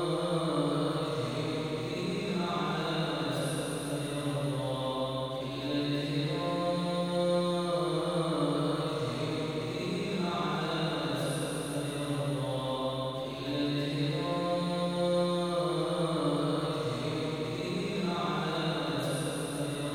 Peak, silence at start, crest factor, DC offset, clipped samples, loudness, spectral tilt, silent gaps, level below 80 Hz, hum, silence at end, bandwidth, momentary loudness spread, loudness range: -18 dBFS; 0 s; 14 dB; under 0.1%; under 0.1%; -32 LUFS; -5.5 dB/octave; none; -60 dBFS; none; 0 s; 16 kHz; 4 LU; 2 LU